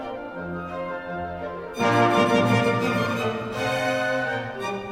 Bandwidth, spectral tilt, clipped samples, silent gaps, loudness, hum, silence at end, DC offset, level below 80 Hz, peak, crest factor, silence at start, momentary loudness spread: 16.5 kHz; -5.5 dB/octave; under 0.1%; none; -24 LUFS; none; 0 s; under 0.1%; -54 dBFS; -8 dBFS; 16 dB; 0 s; 13 LU